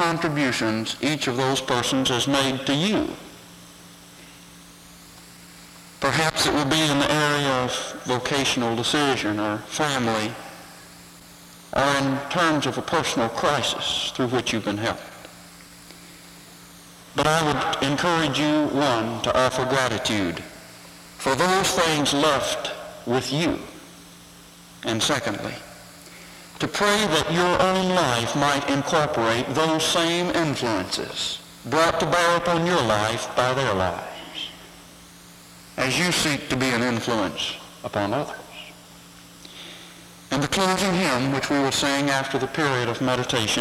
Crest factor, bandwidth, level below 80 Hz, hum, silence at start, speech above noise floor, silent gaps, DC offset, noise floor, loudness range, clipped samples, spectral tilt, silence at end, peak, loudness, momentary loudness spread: 16 dB; 16.5 kHz; -52 dBFS; none; 0 s; 24 dB; none; under 0.1%; -46 dBFS; 6 LU; under 0.1%; -3.5 dB/octave; 0 s; -8 dBFS; -22 LUFS; 22 LU